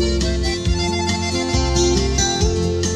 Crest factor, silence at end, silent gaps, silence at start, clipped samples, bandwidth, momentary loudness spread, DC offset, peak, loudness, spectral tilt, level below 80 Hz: 14 dB; 0 s; none; 0 s; under 0.1%; 12 kHz; 3 LU; under 0.1%; -4 dBFS; -19 LUFS; -4 dB/octave; -24 dBFS